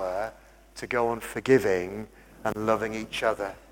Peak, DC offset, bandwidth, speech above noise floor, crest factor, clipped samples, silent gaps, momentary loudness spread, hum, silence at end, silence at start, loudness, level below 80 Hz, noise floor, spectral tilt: -8 dBFS; under 0.1%; 17 kHz; 23 dB; 20 dB; under 0.1%; none; 17 LU; none; 0.1 s; 0 s; -28 LUFS; -54 dBFS; -50 dBFS; -5 dB/octave